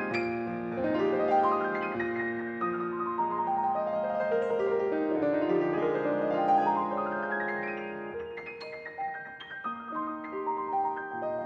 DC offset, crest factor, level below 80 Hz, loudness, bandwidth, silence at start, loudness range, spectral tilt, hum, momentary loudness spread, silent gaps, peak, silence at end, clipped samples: under 0.1%; 16 dB; -68 dBFS; -30 LUFS; 7.8 kHz; 0 s; 7 LU; -7.5 dB/octave; none; 11 LU; none; -14 dBFS; 0 s; under 0.1%